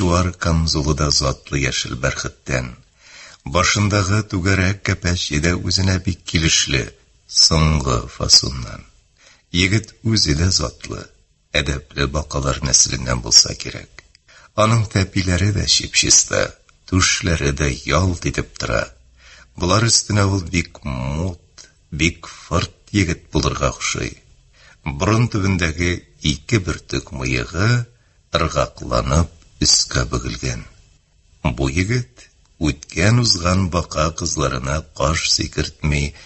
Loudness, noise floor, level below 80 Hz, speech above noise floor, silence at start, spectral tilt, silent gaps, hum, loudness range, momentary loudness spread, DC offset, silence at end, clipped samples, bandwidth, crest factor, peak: -18 LUFS; -54 dBFS; -30 dBFS; 36 dB; 0 s; -3.5 dB/octave; none; none; 5 LU; 13 LU; under 0.1%; 0 s; under 0.1%; 8.6 kHz; 20 dB; 0 dBFS